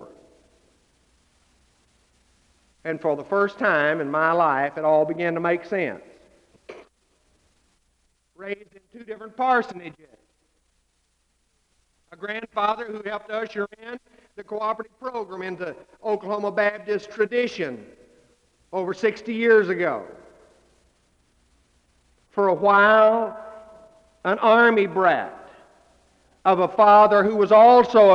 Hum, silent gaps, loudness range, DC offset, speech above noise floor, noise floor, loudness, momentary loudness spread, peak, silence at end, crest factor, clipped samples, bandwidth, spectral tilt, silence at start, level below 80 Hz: none; none; 12 LU; under 0.1%; 49 dB; -69 dBFS; -20 LUFS; 21 LU; -4 dBFS; 0 s; 18 dB; under 0.1%; 7.8 kHz; -6.5 dB/octave; 0 s; -66 dBFS